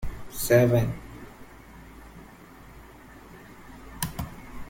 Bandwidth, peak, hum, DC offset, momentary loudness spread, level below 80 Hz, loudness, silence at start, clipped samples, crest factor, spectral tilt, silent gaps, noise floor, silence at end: 17 kHz; -6 dBFS; none; under 0.1%; 27 LU; -44 dBFS; -25 LUFS; 0 s; under 0.1%; 22 dB; -6 dB/octave; none; -48 dBFS; 0 s